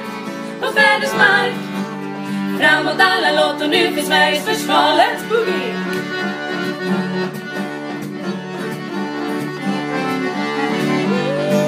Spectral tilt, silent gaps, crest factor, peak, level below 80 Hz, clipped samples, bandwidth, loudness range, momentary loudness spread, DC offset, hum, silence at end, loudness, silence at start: -4.5 dB/octave; none; 16 dB; 0 dBFS; -70 dBFS; under 0.1%; 15.5 kHz; 8 LU; 12 LU; under 0.1%; none; 0 s; -17 LUFS; 0 s